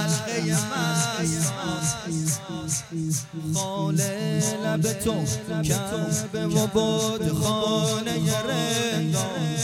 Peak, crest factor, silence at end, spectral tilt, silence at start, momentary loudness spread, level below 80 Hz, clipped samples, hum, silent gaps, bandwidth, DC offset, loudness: -8 dBFS; 16 dB; 0 s; -4.5 dB/octave; 0 s; 4 LU; -52 dBFS; under 0.1%; none; none; 16.5 kHz; under 0.1%; -25 LUFS